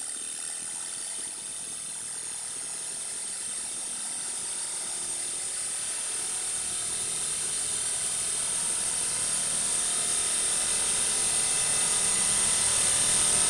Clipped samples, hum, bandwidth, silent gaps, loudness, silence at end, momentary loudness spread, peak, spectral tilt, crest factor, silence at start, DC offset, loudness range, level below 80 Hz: under 0.1%; none; 11.5 kHz; none; -26 LUFS; 0 s; 10 LU; -12 dBFS; 0.5 dB/octave; 18 dB; 0 s; under 0.1%; 9 LU; -60 dBFS